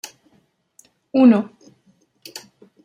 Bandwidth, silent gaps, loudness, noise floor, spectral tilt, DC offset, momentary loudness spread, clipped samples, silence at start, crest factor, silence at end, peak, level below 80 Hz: 15 kHz; none; -16 LUFS; -62 dBFS; -6 dB/octave; under 0.1%; 25 LU; under 0.1%; 1.15 s; 20 dB; 0.45 s; -2 dBFS; -74 dBFS